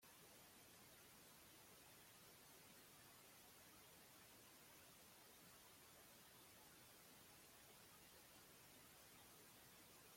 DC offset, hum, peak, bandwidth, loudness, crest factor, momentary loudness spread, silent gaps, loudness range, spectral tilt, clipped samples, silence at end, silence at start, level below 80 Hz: under 0.1%; none; -54 dBFS; 16.5 kHz; -65 LUFS; 14 dB; 0 LU; none; 0 LU; -2 dB/octave; under 0.1%; 0 s; 0 s; -88 dBFS